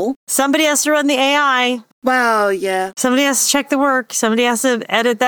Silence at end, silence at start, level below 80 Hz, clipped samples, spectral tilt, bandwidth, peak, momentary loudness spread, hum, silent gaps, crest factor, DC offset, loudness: 0 s; 0 s; -66 dBFS; under 0.1%; -1.5 dB/octave; over 20 kHz; -2 dBFS; 5 LU; none; 0.16-0.27 s, 1.92-2.02 s; 14 dB; under 0.1%; -15 LUFS